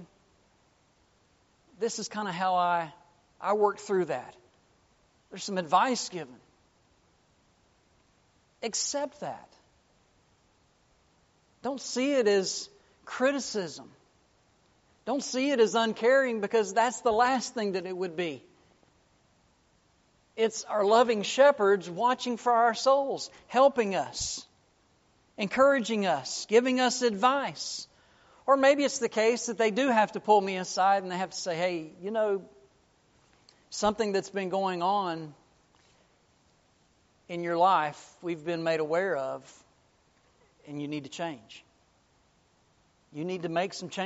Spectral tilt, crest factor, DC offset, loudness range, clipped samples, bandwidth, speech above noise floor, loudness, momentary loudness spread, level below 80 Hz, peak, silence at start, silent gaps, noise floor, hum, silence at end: -2.5 dB/octave; 20 dB; under 0.1%; 12 LU; under 0.1%; 8 kHz; 39 dB; -28 LUFS; 15 LU; -70 dBFS; -10 dBFS; 0 s; none; -67 dBFS; none; 0 s